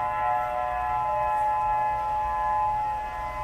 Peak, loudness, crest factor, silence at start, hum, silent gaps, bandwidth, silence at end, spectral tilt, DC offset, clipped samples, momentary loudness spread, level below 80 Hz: -16 dBFS; -26 LUFS; 10 dB; 0 s; none; none; 14 kHz; 0 s; -5 dB/octave; under 0.1%; under 0.1%; 3 LU; -46 dBFS